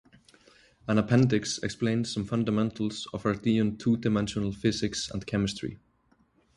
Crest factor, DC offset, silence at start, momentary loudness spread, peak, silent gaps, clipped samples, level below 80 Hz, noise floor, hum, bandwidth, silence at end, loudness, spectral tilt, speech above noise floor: 18 dB; under 0.1%; 0.85 s; 8 LU; -10 dBFS; none; under 0.1%; -54 dBFS; -67 dBFS; none; 11.5 kHz; 0.8 s; -28 LUFS; -5.5 dB/octave; 39 dB